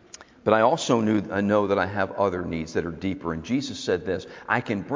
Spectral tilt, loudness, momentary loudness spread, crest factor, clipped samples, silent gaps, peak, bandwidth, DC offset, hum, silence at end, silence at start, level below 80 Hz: -5.5 dB/octave; -25 LUFS; 9 LU; 20 dB; under 0.1%; none; -4 dBFS; 7.6 kHz; under 0.1%; none; 0 s; 0.2 s; -50 dBFS